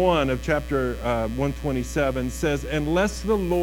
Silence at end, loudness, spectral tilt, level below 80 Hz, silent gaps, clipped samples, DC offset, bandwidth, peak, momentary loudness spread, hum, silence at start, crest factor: 0 s; -24 LUFS; -6 dB/octave; -34 dBFS; none; under 0.1%; under 0.1%; 18 kHz; -8 dBFS; 3 LU; none; 0 s; 16 dB